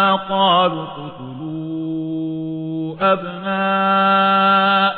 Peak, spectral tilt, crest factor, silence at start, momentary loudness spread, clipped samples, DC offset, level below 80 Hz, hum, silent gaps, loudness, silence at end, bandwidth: -4 dBFS; -8.5 dB/octave; 14 dB; 0 s; 15 LU; under 0.1%; under 0.1%; -58 dBFS; none; none; -17 LUFS; 0 s; 4.8 kHz